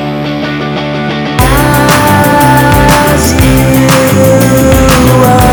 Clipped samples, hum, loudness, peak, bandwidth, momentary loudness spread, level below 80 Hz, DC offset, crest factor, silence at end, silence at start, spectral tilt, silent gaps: 3%; none; -7 LUFS; 0 dBFS; over 20 kHz; 8 LU; -18 dBFS; under 0.1%; 6 dB; 0 s; 0 s; -5 dB/octave; none